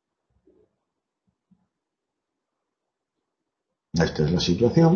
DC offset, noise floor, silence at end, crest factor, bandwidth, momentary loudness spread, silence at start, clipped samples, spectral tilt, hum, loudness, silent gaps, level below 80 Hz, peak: under 0.1%; -84 dBFS; 0 s; 20 dB; 7 kHz; 6 LU; 3.95 s; under 0.1%; -6.5 dB/octave; none; -22 LUFS; none; -50 dBFS; -6 dBFS